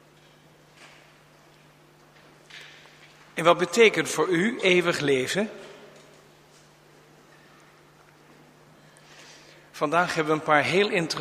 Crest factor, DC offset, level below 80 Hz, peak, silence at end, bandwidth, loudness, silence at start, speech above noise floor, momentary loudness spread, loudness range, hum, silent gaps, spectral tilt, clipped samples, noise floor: 24 dB; under 0.1%; -70 dBFS; -4 dBFS; 0 s; 15.5 kHz; -23 LUFS; 2.55 s; 33 dB; 26 LU; 10 LU; none; none; -4 dB/octave; under 0.1%; -55 dBFS